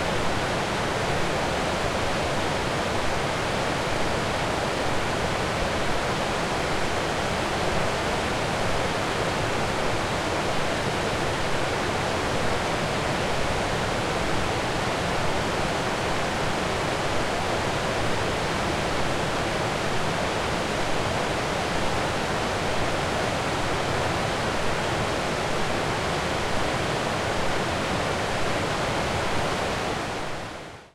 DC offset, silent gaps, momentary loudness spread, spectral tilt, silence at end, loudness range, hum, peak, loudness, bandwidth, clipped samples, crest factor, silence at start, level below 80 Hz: under 0.1%; none; 1 LU; -4 dB/octave; 0.1 s; 0 LU; none; -12 dBFS; -26 LUFS; 16.5 kHz; under 0.1%; 14 dB; 0 s; -40 dBFS